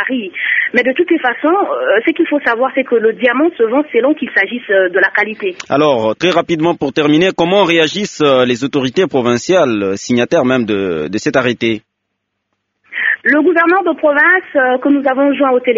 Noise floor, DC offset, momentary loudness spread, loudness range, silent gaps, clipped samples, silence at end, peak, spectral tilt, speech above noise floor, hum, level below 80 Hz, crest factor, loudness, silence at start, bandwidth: -72 dBFS; under 0.1%; 6 LU; 3 LU; none; under 0.1%; 0 s; 0 dBFS; -3 dB/octave; 59 dB; none; -56 dBFS; 12 dB; -13 LUFS; 0 s; 7.6 kHz